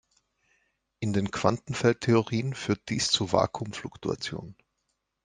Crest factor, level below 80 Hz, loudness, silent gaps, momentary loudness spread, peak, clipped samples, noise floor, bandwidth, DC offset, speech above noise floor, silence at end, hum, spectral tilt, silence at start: 24 dB; -60 dBFS; -28 LUFS; none; 12 LU; -6 dBFS; under 0.1%; -79 dBFS; 9.8 kHz; under 0.1%; 52 dB; 0.7 s; none; -5 dB/octave; 1 s